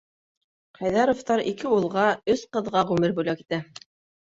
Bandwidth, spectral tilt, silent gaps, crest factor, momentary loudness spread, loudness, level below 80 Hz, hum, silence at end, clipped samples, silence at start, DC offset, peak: 8 kHz; -6 dB/octave; none; 18 dB; 9 LU; -24 LUFS; -60 dBFS; none; 0.6 s; under 0.1%; 0.8 s; under 0.1%; -8 dBFS